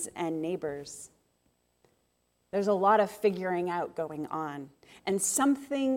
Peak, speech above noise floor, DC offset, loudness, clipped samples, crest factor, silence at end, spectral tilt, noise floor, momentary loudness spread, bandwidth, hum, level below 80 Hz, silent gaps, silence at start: -12 dBFS; 44 dB; under 0.1%; -30 LUFS; under 0.1%; 18 dB; 0 s; -4 dB/octave; -74 dBFS; 18 LU; 17 kHz; none; -72 dBFS; none; 0 s